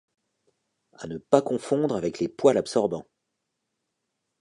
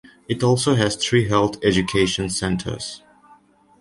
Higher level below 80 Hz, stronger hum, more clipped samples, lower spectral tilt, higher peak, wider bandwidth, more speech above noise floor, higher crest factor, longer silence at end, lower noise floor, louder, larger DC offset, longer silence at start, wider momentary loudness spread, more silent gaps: second, -64 dBFS vs -44 dBFS; neither; neither; about the same, -6 dB/octave vs -5 dB/octave; about the same, -4 dBFS vs -4 dBFS; about the same, 11 kHz vs 11.5 kHz; first, 56 dB vs 33 dB; first, 24 dB vs 18 dB; first, 1.4 s vs 0.85 s; first, -81 dBFS vs -53 dBFS; second, -24 LUFS vs -20 LUFS; neither; first, 1 s vs 0.3 s; first, 16 LU vs 11 LU; neither